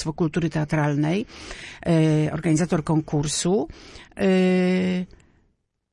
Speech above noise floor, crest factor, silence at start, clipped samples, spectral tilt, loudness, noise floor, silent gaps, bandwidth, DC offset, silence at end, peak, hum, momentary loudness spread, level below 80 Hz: 46 dB; 14 dB; 0 s; under 0.1%; -6 dB/octave; -22 LUFS; -68 dBFS; none; 11 kHz; under 0.1%; 0.9 s; -8 dBFS; none; 16 LU; -48 dBFS